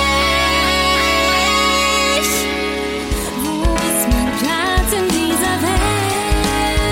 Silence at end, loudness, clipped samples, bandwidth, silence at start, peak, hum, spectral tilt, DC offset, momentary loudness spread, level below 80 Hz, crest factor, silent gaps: 0 s; -15 LUFS; under 0.1%; 16.5 kHz; 0 s; -4 dBFS; none; -3 dB/octave; under 0.1%; 6 LU; -24 dBFS; 12 dB; none